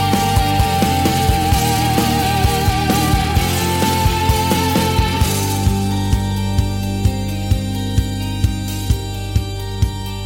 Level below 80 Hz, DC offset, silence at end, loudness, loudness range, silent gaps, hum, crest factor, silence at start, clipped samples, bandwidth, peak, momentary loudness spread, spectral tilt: -24 dBFS; under 0.1%; 0 s; -17 LUFS; 4 LU; none; none; 12 dB; 0 s; under 0.1%; 17 kHz; -4 dBFS; 6 LU; -5 dB/octave